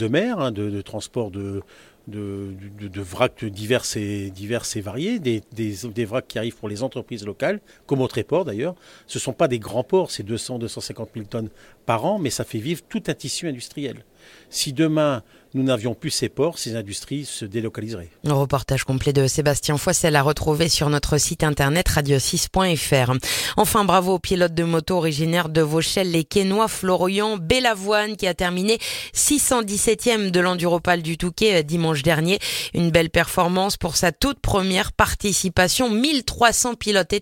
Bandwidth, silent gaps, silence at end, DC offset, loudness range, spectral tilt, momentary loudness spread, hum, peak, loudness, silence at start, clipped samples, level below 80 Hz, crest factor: 17 kHz; none; 0 s; under 0.1%; 7 LU; -4 dB/octave; 12 LU; none; 0 dBFS; -21 LUFS; 0 s; under 0.1%; -40 dBFS; 20 dB